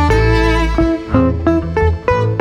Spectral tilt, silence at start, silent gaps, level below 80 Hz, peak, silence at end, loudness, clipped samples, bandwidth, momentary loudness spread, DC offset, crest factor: -7.5 dB/octave; 0 s; none; -20 dBFS; 0 dBFS; 0 s; -14 LUFS; under 0.1%; 10.5 kHz; 3 LU; under 0.1%; 12 dB